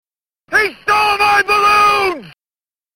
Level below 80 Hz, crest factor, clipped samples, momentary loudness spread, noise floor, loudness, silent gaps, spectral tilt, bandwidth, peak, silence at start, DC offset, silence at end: -48 dBFS; 14 dB; under 0.1%; 7 LU; under -90 dBFS; -12 LUFS; none; -2 dB/octave; 16.5 kHz; 0 dBFS; 0.5 s; under 0.1%; 0.65 s